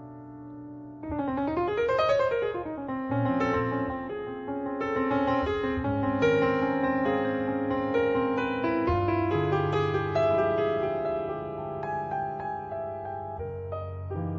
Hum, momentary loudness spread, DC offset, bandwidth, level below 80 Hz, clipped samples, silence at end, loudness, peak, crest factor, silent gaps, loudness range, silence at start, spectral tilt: none; 11 LU; under 0.1%; 7.4 kHz; -50 dBFS; under 0.1%; 0 s; -28 LUFS; -12 dBFS; 16 dB; none; 3 LU; 0 s; -8 dB/octave